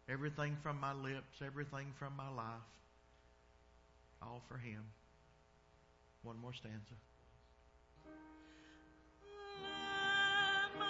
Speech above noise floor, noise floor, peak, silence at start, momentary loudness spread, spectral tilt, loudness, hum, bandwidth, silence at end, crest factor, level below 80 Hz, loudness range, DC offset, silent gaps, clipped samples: 23 dB; -70 dBFS; -26 dBFS; 0.1 s; 26 LU; -2 dB/octave; -42 LUFS; none; 7.6 kHz; 0 s; 20 dB; -72 dBFS; 16 LU; under 0.1%; none; under 0.1%